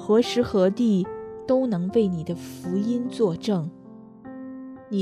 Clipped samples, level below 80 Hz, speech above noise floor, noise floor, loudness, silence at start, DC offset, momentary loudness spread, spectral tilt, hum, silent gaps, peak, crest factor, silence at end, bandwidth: under 0.1%; -60 dBFS; 21 dB; -44 dBFS; -24 LUFS; 0 s; under 0.1%; 17 LU; -7 dB/octave; none; none; -8 dBFS; 16 dB; 0 s; 13.5 kHz